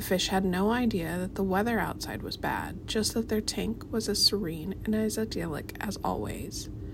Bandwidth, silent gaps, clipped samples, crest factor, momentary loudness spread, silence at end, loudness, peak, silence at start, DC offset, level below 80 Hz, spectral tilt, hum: 16 kHz; none; under 0.1%; 18 dB; 11 LU; 0 s; -30 LUFS; -12 dBFS; 0 s; under 0.1%; -46 dBFS; -4 dB/octave; none